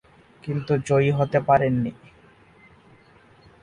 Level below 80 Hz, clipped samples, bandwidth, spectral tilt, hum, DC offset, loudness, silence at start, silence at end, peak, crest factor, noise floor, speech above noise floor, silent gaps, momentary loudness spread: -54 dBFS; under 0.1%; 10 kHz; -7.5 dB/octave; none; under 0.1%; -22 LUFS; 0.45 s; 1.7 s; -6 dBFS; 20 dB; -54 dBFS; 32 dB; none; 12 LU